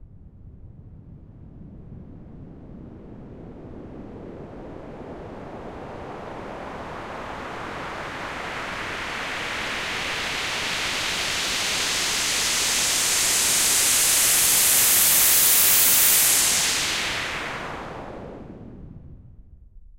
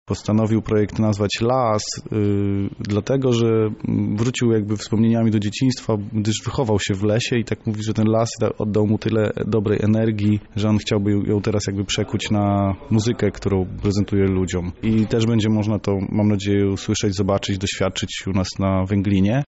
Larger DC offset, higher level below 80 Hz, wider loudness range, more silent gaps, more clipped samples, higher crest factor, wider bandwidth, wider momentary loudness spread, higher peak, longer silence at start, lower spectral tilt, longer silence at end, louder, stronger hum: neither; about the same, -48 dBFS vs -44 dBFS; first, 23 LU vs 1 LU; neither; neither; first, 20 dB vs 12 dB; first, 16 kHz vs 8 kHz; first, 25 LU vs 4 LU; first, -4 dBFS vs -8 dBFS; about the same, 0 s vs 0.1 s; second, 0 dB/octave vs -6.5 dB/octave; about the same, 0.05 s vs 0.05 s; about the same, -18 LUFS vs -20 LUFS; neither